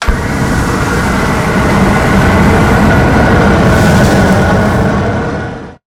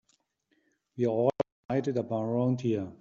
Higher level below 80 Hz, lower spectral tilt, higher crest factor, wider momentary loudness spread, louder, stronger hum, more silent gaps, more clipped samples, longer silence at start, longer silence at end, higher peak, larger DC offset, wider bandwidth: first, -18 dBFS vs -68 dBFS; second, -6.5 dB/octave vs -8.5 dB/octave; second, 8 dB vs 20 dB; about the same, 6 LU vs 5 LU; first, -9 LUFS vs -30 LUFS; neither; second, none vs 1.52-1.69 s; neither; second, 0 s vs 0.95 s; about the same, 0.1 s vs 0.05 s; first, 0 dBFS vs -12 dBFS; neither; first, 17 kHz vs 7.4 kHz